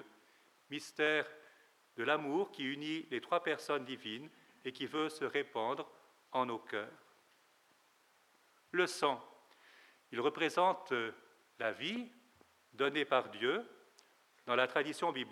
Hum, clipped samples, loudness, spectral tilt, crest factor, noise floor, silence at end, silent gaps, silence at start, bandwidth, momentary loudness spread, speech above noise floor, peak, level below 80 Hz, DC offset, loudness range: none; under 0.1%; -37 LUFS; -4 dB/octave; 24 dB; -71 dBFS; 0 s; none; 0 s; 15.5 kHz; 13 LU; 34 dB; -16 dBFS; under -90 dBFS; under 0.1%; 5 LU